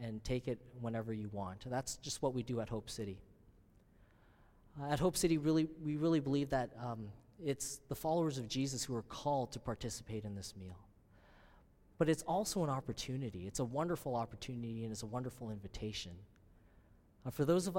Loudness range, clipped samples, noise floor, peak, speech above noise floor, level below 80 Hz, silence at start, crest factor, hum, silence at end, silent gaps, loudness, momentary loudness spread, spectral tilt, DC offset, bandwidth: 7 LU; under 0.1%; -66 dBFS; -20 dBFS; 28 dB; -60 dBFS; 0 s; 18 dB; none; 0 s; none; -39 LUFS; 13 LU; -5.5 dB/octave; under 0.1%; 16.5 kHz